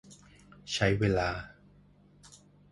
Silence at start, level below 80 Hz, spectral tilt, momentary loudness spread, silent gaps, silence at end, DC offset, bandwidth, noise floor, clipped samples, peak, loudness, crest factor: 0.1 s; -50 dBFS; -5.5 dB/octave; 23 LU; none; 0.45 s; under 0.1%; 11.5 kHz; -60 dBFS; under 0.1%; -12 dBFS; -30 LUFS; 22 dB